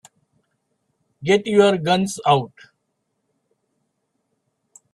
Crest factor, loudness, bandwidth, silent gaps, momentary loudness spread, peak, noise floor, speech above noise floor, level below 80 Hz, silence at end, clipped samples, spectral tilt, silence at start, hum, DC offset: 20 dB; -18 LUFS; 12.5 kHz; none; 9 LU; -2 dBFS; -74 dBFS; 56 dB; -64 dBFS; 2.45 s; under 0.1%; -5 dB/octave; 1.2 s; none; under 0.1%